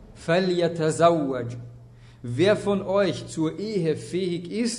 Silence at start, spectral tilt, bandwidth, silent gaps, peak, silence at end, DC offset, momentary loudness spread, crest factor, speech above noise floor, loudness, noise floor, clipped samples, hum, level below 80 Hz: 0 s; -5.5 dB/octave; 11 kHz; none; -6 dBFS; 0 s; under 0.1%; 13 LU; 18 dB; 24 dB; -24 LUFS; -47 dBFS; under 0.1%; none; -56 dBFS